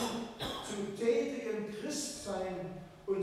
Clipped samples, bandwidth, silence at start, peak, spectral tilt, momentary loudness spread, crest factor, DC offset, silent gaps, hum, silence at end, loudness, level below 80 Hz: under 0.1%; 15.5 kHz; 0 s; -18 dBFS; -4 dB/octave; 8 LU; 18 dB; under 0.1%; none; none; 0 s; -37 LUFS; -62 dBFS